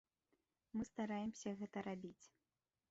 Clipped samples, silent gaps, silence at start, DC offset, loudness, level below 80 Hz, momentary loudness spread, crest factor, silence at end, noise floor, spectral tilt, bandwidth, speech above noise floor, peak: under 0.1%; none; 0.75 s; under 0.1%; -48 LUFS; -78 dBFS; 9 LU; 16 dB; 0.65 s; under -90 dBFS; -6 dB/octave; 7.6 kHz; over 43 dB; -32 dBFS